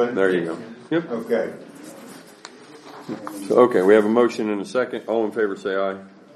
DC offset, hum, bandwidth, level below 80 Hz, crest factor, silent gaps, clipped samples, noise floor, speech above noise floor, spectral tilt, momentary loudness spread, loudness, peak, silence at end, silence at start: under 0.1%; none; 13 kHz; -74 dBFS; 20 dB; none; under 0.1%; -43 dBFS; 23 dB; -6 dB/octave; 25 LU; -21 LUFS; -2 dBFS; 0.25 s; 0 s